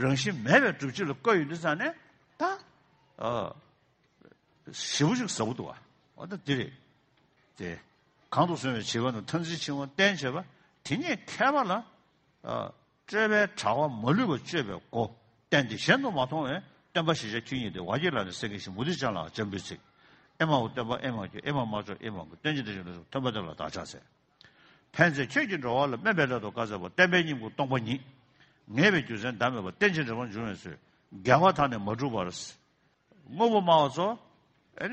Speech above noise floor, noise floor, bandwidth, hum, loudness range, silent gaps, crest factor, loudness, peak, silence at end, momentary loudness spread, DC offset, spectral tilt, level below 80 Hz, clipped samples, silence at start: 40 dB; -69 dBFS; 8.4 kHz; none; 6 LU; none; 24 dB; -29 LUFS; -6 dBFS; 0 s; 15 LU; under 0.1%; -5 dB/octave; -64 dBFS; under 0.1%; 0 s